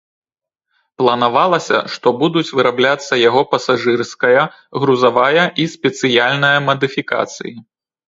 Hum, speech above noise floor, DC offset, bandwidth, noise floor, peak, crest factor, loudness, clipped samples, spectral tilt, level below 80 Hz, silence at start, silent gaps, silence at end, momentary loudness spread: none; 64 dB; under 0.1%; 7.8 kHz; -78 dBFS; 0 dBFS; 16 dB; -15 LUFS; under 0.1%; -4.5 dB/octave; -62 dBFS; 1 s; none; 0.5 s; 7 LU